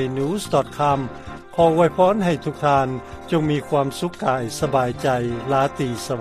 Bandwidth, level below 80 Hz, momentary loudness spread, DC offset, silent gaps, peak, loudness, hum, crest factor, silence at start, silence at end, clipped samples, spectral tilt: 15 kHz; -46 dBFS; 9 LU; under 0.1%; none; -4 dBFS; -21 LUFS; none; 18 dB; 0 s; 0 s; under 0.1%; -6 dB/octave